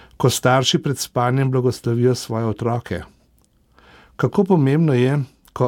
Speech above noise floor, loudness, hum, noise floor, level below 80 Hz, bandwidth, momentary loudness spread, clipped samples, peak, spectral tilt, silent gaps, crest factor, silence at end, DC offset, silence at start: 40 dB; -19 LUFS; none; -58 dBFS; -52 dBFS; 17.5 kHz; 8 LU; under 0.1%; -4 dBFS; -5.5 dB/octave; none; 16 dB; 0 s; under 0.1%; 0.2 s